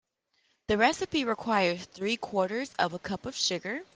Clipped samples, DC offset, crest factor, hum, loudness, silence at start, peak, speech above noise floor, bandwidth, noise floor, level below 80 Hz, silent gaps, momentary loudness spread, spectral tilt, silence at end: under 0.1%; under 0.1%; 20 dB; none; -29 LUFS; 0.7 s; -10 dBFS; 44 dB; 10 kHz; -73 dBFS; -62 dBFS; none; 9 LU; -3.5 dB/octave; 0.1 s